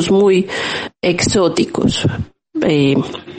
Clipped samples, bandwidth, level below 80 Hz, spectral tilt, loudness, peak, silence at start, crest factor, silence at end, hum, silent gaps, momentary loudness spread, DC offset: under 0.1%; 9.4 kHz; -40 dBFS; -5 dB/octave; -15 LUFS; -2 dBFS; 0 s; 14 dB; 0 s; none; none; 8 LU; under 0.1%